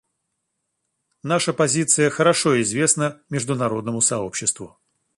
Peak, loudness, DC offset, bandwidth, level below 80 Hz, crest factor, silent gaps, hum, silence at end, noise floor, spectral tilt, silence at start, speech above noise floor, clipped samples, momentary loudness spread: -2 dBFS; -20 LUFS; under 0.1%; 11.5 kHz; -62 dBFS; 20 dB; none; none; 0.5 s; -77 dBFS; -3.5 dB/octave; 1.25 s; 56 dB; under 0.1%; 8 LU